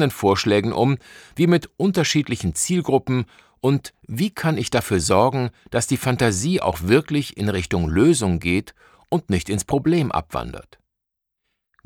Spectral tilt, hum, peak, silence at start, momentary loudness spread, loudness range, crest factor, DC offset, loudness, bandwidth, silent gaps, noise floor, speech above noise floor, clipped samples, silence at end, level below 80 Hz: -5 dB/octave; none; -4 dBFS; 0 s; 8 LU; 2 LU; 18 dB; under 0.1%; -21 LUFS; 18 kHz; none; -81 dBFS; 61 dB; under 0.1%; 1.25 s; -42 dBFS